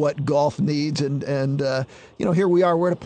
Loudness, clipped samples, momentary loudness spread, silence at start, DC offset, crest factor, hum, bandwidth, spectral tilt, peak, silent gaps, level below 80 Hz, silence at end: -22 LUFS; under 0.1%; 8 LU; 0 s; under 0.1%; 14 dB; none; 9.4 kHz; -7 dB/octave; -8 dBFS; none; -58 dBFS; 0 s